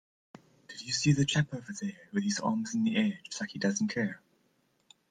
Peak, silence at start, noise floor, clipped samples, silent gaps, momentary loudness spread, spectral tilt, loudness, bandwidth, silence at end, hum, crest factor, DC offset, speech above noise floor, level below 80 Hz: -12 dBFS; 0.7 s; -72 dBFS; under 0.1%; none; 12 LU; -4.5 dB/octave; -31 LUFS; 9.8 kHz; 0.95 s; none; 20 dB; under 0.1%; 41 dB; -66 dBFS